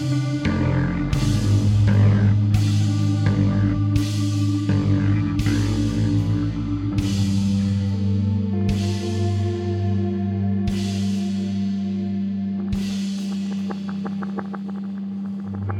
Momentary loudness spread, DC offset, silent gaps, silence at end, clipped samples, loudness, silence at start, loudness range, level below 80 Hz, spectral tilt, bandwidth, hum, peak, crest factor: 9 LU; under 0.1%; none; 0 s; under 0.1%; -22 LUFS; 0 s; 6 LU; -36 dBFS; -7.5 dB/octave; 11 kHz; none; -6 dBFS; 14 dB